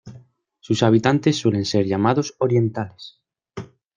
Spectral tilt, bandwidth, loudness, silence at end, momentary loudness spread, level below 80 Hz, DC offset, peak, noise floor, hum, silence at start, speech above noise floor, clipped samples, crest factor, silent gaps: -6 dB/octave; 9.6 kHz; -20 LUFS; 0.3 s; 21 LU; -58 dBFS; under 0.1%; -2 dBFS; -51 dBFS; none; 0.05 s; 32 dB; under 0.1%; 18 dB; none